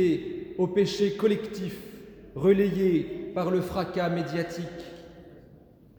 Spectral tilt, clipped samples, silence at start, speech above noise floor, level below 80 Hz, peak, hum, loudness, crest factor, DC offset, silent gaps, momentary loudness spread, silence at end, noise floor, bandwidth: -7 dB/octave; under 0.1%; 0 s; 28 dB; -56 dBFS; -10 dBFS; none; -27 LUFS; 18 dB; under 0.1%; none; 19 LU; 0.55 s; -54 dBFS; over 20 kHz